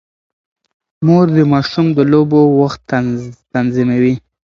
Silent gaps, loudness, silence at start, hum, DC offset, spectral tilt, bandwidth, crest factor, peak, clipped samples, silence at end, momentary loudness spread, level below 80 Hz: none; -13 LUFS; 1 s; none; under 0.1%; -8.5 dB/octave; 7.4 kHz; 14 dB; 0 dBFS; under 0.1%; 0.3 s; 8 LU; -48 dBFS